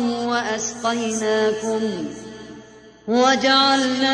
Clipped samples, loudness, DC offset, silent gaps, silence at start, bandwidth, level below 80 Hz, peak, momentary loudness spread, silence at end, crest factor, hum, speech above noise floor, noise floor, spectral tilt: under 0.1%; -19 LUFS; under 0.1%; none; 0 s; 10.5 kHz; -58 dBFS; -4 dBFS; 21 LU; 0 s; 16 dB; none; 24 dB; -44 dBFS; -2.5 dB/octave